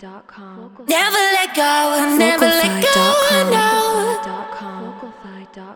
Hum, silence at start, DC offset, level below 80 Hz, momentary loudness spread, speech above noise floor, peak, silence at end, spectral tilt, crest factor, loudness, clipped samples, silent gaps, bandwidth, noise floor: none; 0 s; under 0.1%; -58 dBFS; 18 LU; 20 dB; 0 dBFS; 0 s; -2.5 dB/octave; 18 dB; -14 LUFS; under 0.1%; none; over 20 kHz; -36 dBFS